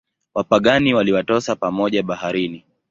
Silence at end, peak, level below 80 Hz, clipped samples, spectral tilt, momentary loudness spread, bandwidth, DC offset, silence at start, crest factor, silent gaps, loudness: 0.3 s; -2 dBFS; -52 dBFS; under 0.1%; -5.5 dB/octave; 10 LU; 7.8 kHz; under 0.1%; 0.35 s; 18 dB; none; -19 LUFS